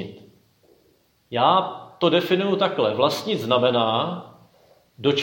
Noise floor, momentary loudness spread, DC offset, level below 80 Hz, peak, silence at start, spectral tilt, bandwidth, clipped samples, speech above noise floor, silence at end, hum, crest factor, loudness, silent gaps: -62 dBFS; 11 LU; under 0.1%; -70 dBFS; -4 dBFS; 0 s; -5.5 dB/octave; 17 kHz; under 0.1%; 41 dB; 0 s; none; 18 dB; -21 LUFS; none